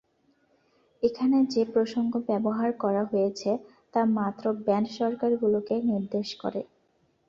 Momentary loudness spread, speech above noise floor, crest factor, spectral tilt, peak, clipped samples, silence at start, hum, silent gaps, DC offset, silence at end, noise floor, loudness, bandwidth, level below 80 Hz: 8 LU; 42 dB; 16 dB; -7 dB/octave; -12 dBFS; under 0.1%; 1 s; none; none; under 0.1%; 0.65 s; -69 dBFS; -27 LUFS; 7.4 kHz; -68 dBFS